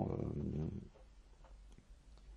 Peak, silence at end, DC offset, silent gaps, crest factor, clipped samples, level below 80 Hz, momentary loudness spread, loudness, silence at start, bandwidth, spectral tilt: -24 dBFS; 0 s; under 0.1%; none; 22 dB; under 0.1%; -56 dBFS; 23 LU; -43 LUFS; 0 s; 9.4 kHz; -9.5 dB/octave